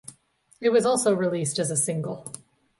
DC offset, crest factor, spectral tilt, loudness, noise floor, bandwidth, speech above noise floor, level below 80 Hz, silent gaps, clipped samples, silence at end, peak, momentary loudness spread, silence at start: under 0.1%; 16 dB; -4.5 dB/octave; -24 LUFS; -59 dBFS; 12 kHz; 35 dB; -68 dBFS; none; under 0.1%; 0.4 s; -10 dBFS; 16 LU; 0.1 s